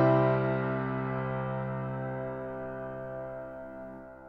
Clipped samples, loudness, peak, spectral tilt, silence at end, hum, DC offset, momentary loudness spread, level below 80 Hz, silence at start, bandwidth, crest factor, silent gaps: under 0.1%; -33 LUFS; -14 dBFS; -10.5 dB/octave; 0 s; none; under 0.1%; 16 LU; -58 dBFS; 0 s; 5 kHz; 18 dB; none